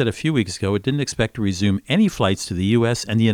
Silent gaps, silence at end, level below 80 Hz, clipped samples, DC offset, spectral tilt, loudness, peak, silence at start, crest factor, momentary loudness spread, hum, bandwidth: none; 0 s; -46 dBFS; under 0.1%; under 0.1%; -5.5 dB/octave; -20 LUFS; -4 dBFS; 0 s; 16 dB; 4 LU; none; 15.5 kHz